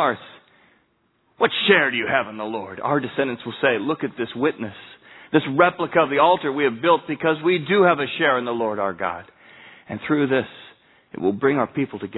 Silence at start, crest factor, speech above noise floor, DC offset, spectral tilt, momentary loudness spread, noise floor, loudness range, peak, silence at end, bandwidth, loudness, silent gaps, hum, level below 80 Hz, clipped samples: 0 s; 22 dB; 44 dB; under 0.1%; -9 dB/octave; 12 LU; -65 dBFS; 6 LU; 0 dBFS; 0 s; 4.1 kHz; -21 LUFS; none; none; -66 dBFS; under 0.1%